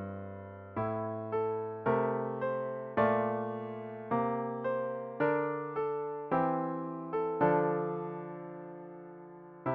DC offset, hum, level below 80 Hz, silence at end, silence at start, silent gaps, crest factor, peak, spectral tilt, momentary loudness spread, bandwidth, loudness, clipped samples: under 0.1%; none; -70 dBFS; 0 s; 0 s; none; 20 dB; -14 dBFS; -7 dB/octave; 16 LU; 4.6 kHz; -34 LUFS; under 0.1%